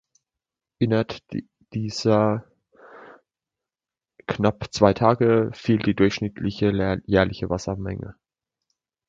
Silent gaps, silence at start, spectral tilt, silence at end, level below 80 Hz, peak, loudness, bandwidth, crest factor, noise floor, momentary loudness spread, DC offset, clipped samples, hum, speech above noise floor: none; 0.8 s; -6.5 dB/octave; 0.95 s; -48 dBFS; -2 dBFS; -23 LUFS; 7.8 kHz; 22 dB; under -90 dBFS; 14 LU; under 0.1%; under 0.1%; none; over 68 dB